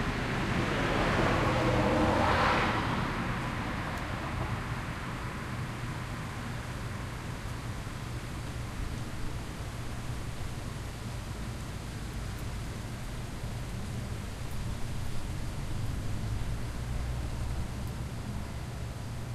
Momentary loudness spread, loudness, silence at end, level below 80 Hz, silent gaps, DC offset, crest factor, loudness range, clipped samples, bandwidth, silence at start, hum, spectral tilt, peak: 12 LU; -34 LUFS; 0 s; -40 dBFS; none; under 0.1%; 20 dB; 11 LU; under 0.1%; 14 kHz; 0 s; none; -5.5 dB/octave; -14 dBFS